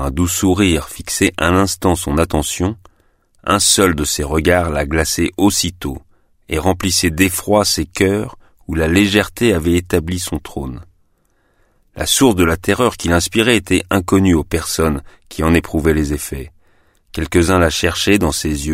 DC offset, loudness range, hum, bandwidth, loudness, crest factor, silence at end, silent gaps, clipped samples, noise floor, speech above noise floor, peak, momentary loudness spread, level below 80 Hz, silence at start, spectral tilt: under 0.1%; 3 LU; none; 16 kHz; -15 LUFS; 16 dB; 0 s; none; under 0.1%; -59 dBFS; 44 dB; 0 dBFS; 12 LU; -30 dBFS; 0 s; -4 dB/octave